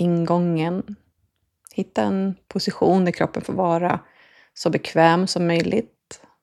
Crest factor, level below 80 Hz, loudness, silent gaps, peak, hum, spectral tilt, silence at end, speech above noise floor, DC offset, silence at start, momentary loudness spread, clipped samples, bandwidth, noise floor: 20 dB; -58 dBFS; -21 LUFS; none; -2 dBFS; none; -6.5 dB/octave; 0.25 s; 50 dB; under 0.1%; 0 s; 12 LU; under 0.1%; 12 kHz; -70 dBFS